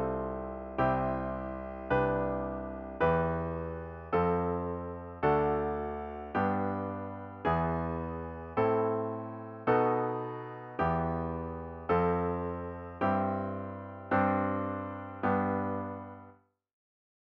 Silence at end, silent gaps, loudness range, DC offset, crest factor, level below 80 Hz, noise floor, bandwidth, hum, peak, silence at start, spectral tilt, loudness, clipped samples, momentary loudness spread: 1 s; none; 2 LU; under 0.1%; 18 dB; -50 dBFS; -59 dBFS; 5.6 kHz; none; -16 dBFS; 0 s; -10 dB/octave; -33 LUFS; under 0.1%; 12 LU